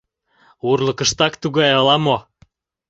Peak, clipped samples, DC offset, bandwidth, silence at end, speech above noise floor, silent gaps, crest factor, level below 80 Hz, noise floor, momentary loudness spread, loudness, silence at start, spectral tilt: -2 dBFS; under 0.1%; under 0.1%; 8.2 kHz; 0.7 s; 40 dB; none; 18 dB; -52 dBFS; -56 dBFS; 7 LU; -17 LUFS; 0.65 s; -4 dB/octave